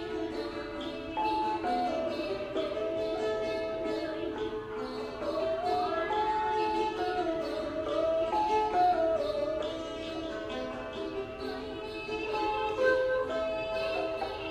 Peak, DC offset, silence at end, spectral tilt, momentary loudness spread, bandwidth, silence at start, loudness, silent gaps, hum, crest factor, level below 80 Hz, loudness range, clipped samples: -14 dBFS; under 0.1%; 0 s; -5 dB/octave; 9 LU; 14.5 kHz; 0 s; -32 LUFS; none; none; 18 dB; -54 dBFS; 4 LU; under 0.1%